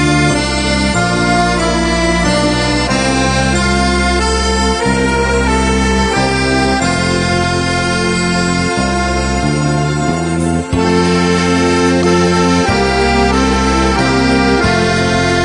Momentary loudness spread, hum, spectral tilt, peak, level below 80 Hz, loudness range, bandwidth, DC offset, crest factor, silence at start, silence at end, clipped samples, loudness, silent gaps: 3 LU; none; -4.5 dB/octave; 0 dBFS; -24 dBFS; 2 LU; 10.5 kHz; under 0.1%; 12 dB; 0 s; 0 s; under 0.1%; -12 LUFS; none